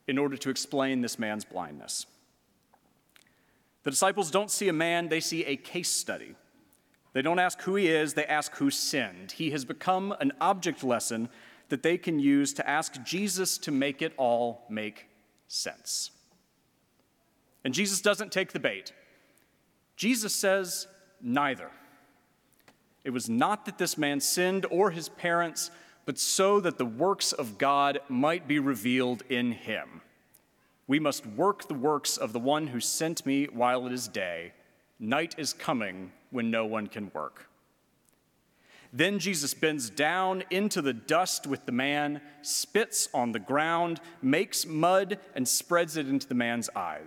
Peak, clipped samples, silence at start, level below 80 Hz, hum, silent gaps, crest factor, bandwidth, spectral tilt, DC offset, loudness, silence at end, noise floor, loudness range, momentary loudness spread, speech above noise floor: -10 dBFS; under 0.1%; 0.1 s; -80 dBFS; none; none; 20 dB; 18 kHz; -3 dB/octave; under 0.1%; -29 LUFS; 0 s; -70 dBFS; 5 LU; 10 LU; 41 dB